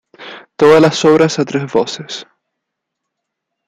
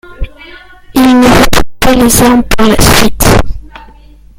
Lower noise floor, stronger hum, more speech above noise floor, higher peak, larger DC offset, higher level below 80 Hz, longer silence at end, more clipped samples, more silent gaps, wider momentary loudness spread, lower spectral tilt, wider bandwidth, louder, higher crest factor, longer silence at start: first, -77 dBFS vs -35 dBFS; neither; first, 65 dB vs 30 dB; about the same, 0 dBFS vs 0 dBFS; neither; second, -54 dBFS vs -18 dBFS; first, 1.45 s vs 0.8 s; second, under 0.1% vs 2%; neither; about the same, 22 LU vs 20 LU; about the same, -5 dB/octave vs -4 dB/octave; second, 10 kHz vs over 20 kHz; second, -12 LUFS vs -7 LUFS; first, 14 dB vs 8 dB; about the same, 0.2 s vs 0.1 s